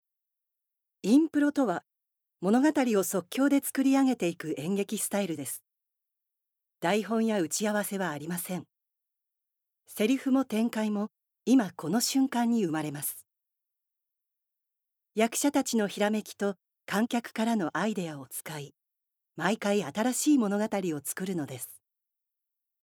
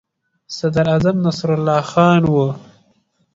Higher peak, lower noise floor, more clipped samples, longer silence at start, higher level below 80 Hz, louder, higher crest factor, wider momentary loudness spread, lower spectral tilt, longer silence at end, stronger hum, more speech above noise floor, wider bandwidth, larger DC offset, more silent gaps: second, -10 dBFS vs 0 dBFS; first, -84 dBFS vs -61 dBFS; neither; first, 1.05 s vs 0.5 s; second, -82 dBFS vs -48 dBFS; second, -29 LUFS vs -16 LUFS; about the same, 20 dB vs 16 dB; about the same, 12 LU vs 10 LU; second, -4.5 dB/octave vs -7 dB/octave; first, 1.05 s vs 0.75 s; neither; first, 56 dB vs 46 dB; first, 19 kHz vs 7.8 kHz; neither; neither